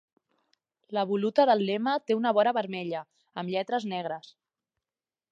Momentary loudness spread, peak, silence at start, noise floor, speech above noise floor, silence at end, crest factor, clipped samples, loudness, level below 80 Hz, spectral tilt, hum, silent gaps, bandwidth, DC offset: 14 LU; -10 dBFS; 0.9 s; under -90 dBFS; over 63 dB; 1 s; 20 dB; under 0.1%; -28 LUFS; -84 dBFS; -6.5 dB/octave; none; none; 7.8 kHz; under 0.1%